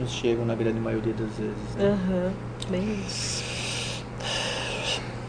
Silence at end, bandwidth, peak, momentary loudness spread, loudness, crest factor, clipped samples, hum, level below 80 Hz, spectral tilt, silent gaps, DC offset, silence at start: 0 s; 10 kHz; -12 dBFS; 6 LU; -28 LUFS; 16 dB; under 0.1%; none; -44 dBFS; -4.5 dB/octave; none; under 0.1%; 0 s